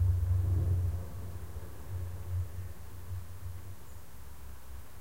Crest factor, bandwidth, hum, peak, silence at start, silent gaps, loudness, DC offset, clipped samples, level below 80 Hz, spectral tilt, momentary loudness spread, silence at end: 16 dB; 16 kHz; none; -20 dBFS; 0 s; none; -36 LUFS; 0.8%; under 0.1%; -42 dBFS; -7 dB/octave; 20 LU; 0 s